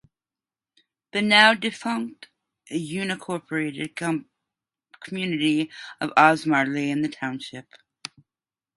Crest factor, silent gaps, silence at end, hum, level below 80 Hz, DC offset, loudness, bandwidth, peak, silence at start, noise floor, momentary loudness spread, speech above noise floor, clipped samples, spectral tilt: 26 dB; none; 1 s; none; -72 dBFS; under 0.1%; -23 LUFS; 11.5 kHz; 0 dBFS; 1.15 s; under -90 dBFS; 20 LU; over 67 dB; under 0.1%; -4.5 dB/octave